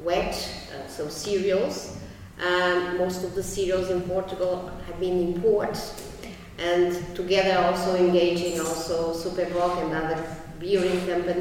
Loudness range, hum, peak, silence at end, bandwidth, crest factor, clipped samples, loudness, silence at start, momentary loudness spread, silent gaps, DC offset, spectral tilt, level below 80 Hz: 3 LU; none; -8 dBFS; 0 s; 16.5 kHz; 16 dB; under 0.1%; -25 LUFS; 0 s; 14 LU; none; under 0.1%; -4.5 dB/octave; -46 dBFS